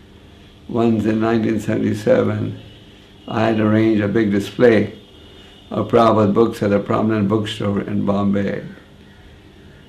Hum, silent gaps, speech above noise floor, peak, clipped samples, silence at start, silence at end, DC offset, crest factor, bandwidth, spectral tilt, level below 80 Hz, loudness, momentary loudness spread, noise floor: none; none; 27 dB; -2 dBFS; under 0.1%; 0.7 s; 1.15 s; under 0.1%; 16 dB; 13.5 kHz; -7.5 dB/octave; -50 dBFS; -18 LUFS; 11 LU; -43 dBFS